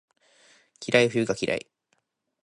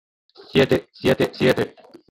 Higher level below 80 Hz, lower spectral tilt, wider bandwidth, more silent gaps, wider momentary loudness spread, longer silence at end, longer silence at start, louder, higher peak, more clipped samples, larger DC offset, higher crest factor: second, -66 dBFS vs -52 dBFS; second, -4.5 dB/octave vs -6 dB/octave; second, 11.5 kHz vs 17 kHz; neither; first, 11 LU vs 5 LU; first, 0.85 s vs 0.4 s; first, 0.8 s vs 0.55 s; second, -25 LUFS vs -21 LUFS; about the same, -4 dBFS vs -4 dBFS; neither; neither; first, 24 dB vs 18 dB